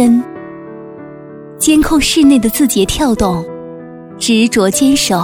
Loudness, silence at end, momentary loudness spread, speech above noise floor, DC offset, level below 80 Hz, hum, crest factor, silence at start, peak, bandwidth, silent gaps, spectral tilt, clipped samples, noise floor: -11 LUFS; 0 s; 22 LU; 21 dB; under 0.1%; -32 dBFS; none; 12 dB; 0 s; 0 dBFS; 17.5 kHz; none; -4 dB/octave; under 0.1%; -31 dBFS